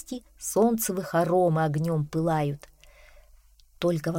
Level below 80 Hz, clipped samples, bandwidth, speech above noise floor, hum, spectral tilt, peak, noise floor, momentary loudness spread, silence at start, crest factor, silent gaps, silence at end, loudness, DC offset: -54 dBFS; under 0.1%; 17 kHz; 31 dB; none; -6 dB/octave; -12 dBFS; -56 dBFS; 10 LU; 0.1 s; 16 dB; none; 0 s; -26 LUFS; under 0.1%